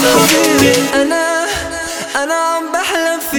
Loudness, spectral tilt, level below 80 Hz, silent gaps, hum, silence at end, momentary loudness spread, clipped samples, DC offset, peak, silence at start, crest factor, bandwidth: -13 LUFS; -2.5 dB/octave; -42 dBFS; none; none; 0 s; 9 LU; under 0.1%; under 0.1%; 0 dBFS; 0 s; 14 dB; over 20 kHz